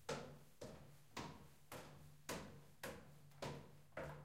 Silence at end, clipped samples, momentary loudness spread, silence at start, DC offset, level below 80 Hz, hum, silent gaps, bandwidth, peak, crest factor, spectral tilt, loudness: 0 s; under 0.1%; 9 LU; 0 s; under 0.1%; -72 dBFS; none; none; 16 kHz; -32 dBFS; 22 dB; -4 dB/octave; -55 LUFS